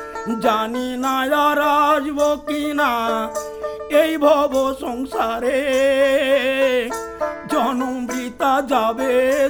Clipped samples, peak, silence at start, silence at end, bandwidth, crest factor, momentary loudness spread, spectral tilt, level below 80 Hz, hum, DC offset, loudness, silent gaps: under 0.1%; -2 dBFS; 0 s; 0 s; over 20 kHz; 16 dB; 10 LU; -3.5 dB/octave; -50 dBFS; none; under 0.1%; -19 LUFS; none